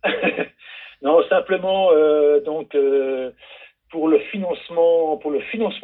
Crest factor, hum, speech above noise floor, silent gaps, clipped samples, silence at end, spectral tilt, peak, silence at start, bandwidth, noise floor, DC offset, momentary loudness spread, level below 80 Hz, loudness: 14 dB; none; 23 dB; none; under 0.1%; 0.05 s; -9 dB/octave; -4 dBFS; 0.05 s; 4.1 kHz; -41 dBFS; under 0.1%; 13 LU; -64 dBFS; -19 LUFS